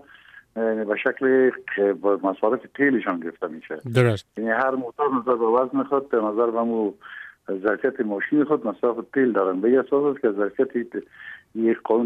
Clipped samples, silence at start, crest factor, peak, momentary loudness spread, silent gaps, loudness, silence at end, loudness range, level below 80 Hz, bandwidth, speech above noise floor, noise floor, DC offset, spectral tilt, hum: under 0.1%; 0.35 s; 18 dB; -6 dBFS; 12 LU; none; -23 LUFS; 0 s; 1 LU; -70 dBFS; 10.5 kHz; 27 dB; -49 dBFS; under 0.1%; -8 dB/octave; none